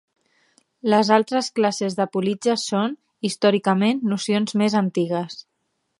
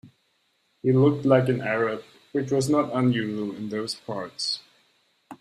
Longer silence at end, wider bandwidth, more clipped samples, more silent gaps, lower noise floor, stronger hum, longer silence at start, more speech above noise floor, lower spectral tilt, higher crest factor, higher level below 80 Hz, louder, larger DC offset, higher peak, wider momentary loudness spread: first, 0.6 s vs 0.05 s; about the same, 11.5 kHz vs 12.5 kHz; neither; neither; first, -74 dBFS vs -69 dBFS; neither; first, 0.85 s vs 0.05 s; first, 53 dB vs 46 dB; about the same, -5 dB/octave vs -6 dB/octave; about the same, 20 dB vs 20 dB; second, -72 dBFS vs -64 dBFS; first, -21 LUFS vs -25 LUFS; neither; first, -2 dBFS vs -6 dBFS; about the same, 9 LU vs 11 LU